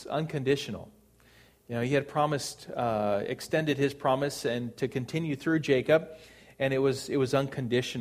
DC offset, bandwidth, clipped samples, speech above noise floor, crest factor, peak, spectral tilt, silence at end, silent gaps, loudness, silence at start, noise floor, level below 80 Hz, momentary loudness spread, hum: under 0.1%; 15.5 kHz; under 0.1%; 30 dB; 20 dB; -10 dBFS; -5.5 dB/octave; 0 s; none; -29 LUFS; 0 s; -59 dBFS; -62 dBFS; 7 LU; none